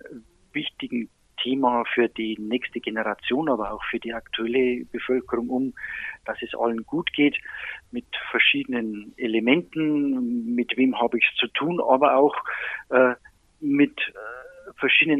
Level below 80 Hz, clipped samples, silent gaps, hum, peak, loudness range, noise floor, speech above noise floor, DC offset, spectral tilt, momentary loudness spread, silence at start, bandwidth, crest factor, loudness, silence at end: -60 dBFS; under 0.1%; none; none; -4 dBFS; 5 LU; -45 dBFS; 21 dB; under 0.1%; -6.5 dB/octave; 13 LU; 0.05 s; 4.1 kHz; 20 dB; -24 LUFS; 0 s